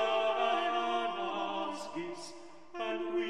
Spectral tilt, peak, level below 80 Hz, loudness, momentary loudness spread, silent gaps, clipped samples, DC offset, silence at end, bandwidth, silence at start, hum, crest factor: -3.5 dB/octave; -18 dBFS; -78 dBFS; -34 LUFS; 16 LU; none; under 0.1%; 0.3%; 0 s; 11 kHz; 0 s; none; 16 dB